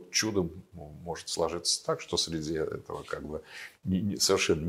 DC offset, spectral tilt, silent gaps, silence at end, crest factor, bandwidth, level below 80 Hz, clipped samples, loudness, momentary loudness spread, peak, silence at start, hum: under 0.1%; -3.5 dB/octave; none; 0 s; 18 dB; 16 kHz; -56 dBFS; under 0.1%; -31 LUFS; 15 LU; -14 dBFS; 0 s; none